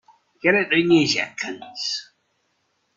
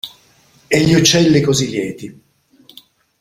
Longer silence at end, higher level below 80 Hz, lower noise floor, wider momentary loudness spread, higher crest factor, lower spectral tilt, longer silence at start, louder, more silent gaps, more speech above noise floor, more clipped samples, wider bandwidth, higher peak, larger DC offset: second, 0.95 s vs 1.1 s; second, -64 dBFS vs -46 dBFS; first, -70 dBFS vs -52 dBFS; second, 13 LU vs 21 LU; about the same, 20 dB vs 16 dB; about the same, -4 dB/octave vs -4.5 dB/octave; first, 0.45 s vs 0.05 s; second, -21 LUFS vs -14 LUFS; neither; first, 49 dB vs 38 dB; neither; second, 7.8 kHz vs 16 kHz; second, -4 dBFS vs 0 dBFS; neither